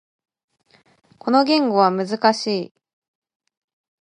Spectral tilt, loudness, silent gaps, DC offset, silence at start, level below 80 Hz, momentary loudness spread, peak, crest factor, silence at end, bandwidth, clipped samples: -5 dB/octave; -19 LUFS; none; under 0.1%; 1.25 s; -76 dBFS; 12 LU; -2 dBFS; 20 dB; 1.35 s; 10.5 kHz; under 0.1%